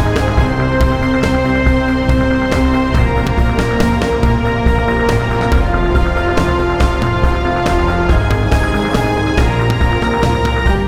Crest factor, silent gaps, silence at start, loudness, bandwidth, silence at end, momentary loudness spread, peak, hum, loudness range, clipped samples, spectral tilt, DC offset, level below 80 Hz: 12 dB; none; 0 s; -14 LUFS; 14 kHz; 0 s; 1 LU; 0 dBFS; none; 1 LU; under 0.1%; -6.5 dB/octave; under 0.1%; -18 dBFS